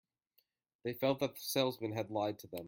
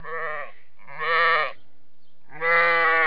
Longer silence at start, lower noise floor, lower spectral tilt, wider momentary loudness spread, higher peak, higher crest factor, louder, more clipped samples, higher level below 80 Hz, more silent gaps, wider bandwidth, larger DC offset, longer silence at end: first, 0.85 s vs 0.05 s; first, -78 dBFS vs -66 dBFS; about the same, -4.5 dB/octave vs -4.5 dB/octave; second, 7 LU vs 17 LU; second, -18 dBFS vs -8 dBFS; first, 22 dB vs 16 dB; second, -37 LUFS vs -21 LUFS; neither; second, -78 dBFS vs -72 dBFS; neither; first, 17 kHz vs 5.2 kHz; second, under 0.1% vs 2%; about the same, 0 s vs 0 s